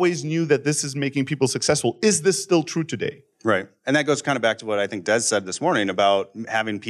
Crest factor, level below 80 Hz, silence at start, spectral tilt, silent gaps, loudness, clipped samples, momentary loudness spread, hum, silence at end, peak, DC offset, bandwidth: 18 dB; -66 dBFS; 0 s; -4 dB/octave; none; -22 LUFS; under 0.1%; 6 LU; none; 0 s; -4 dBFS; under 0.1%; 13.5 kHz